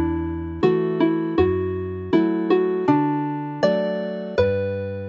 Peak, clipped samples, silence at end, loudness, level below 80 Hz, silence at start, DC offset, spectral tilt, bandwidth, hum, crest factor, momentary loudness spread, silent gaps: -6 dBFS; under 0.1%; 0 s; -22 LUFS; -44 dBFS; 0 s; under 0.1%; -8.5 dB/octave; 7 kHz; none; 16 dB; 7 LU; none